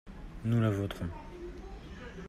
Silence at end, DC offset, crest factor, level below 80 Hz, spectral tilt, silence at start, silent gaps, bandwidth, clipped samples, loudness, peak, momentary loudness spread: 0 s; under 0.1%; 18 dB; -48 dBFS; -8 dB/octave; 0.05 s; none; 13.5 kHz; under 0.1%; -33 LUFS; -16 dBFS; 18 LU